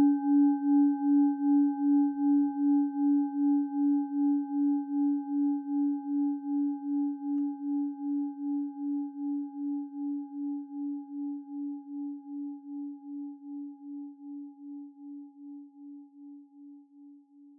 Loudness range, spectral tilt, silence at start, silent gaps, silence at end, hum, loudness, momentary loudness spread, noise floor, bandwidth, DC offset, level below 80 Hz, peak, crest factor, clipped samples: 18 LU; -11 dB/octave; 0 s; none; 0.1 s; none; -30 LUFS; 20 LU; -55 dBFS; 1.6 kHz; under 0.1%; -86 dBFS; -16 dBFS; 14 dB; under 0.1%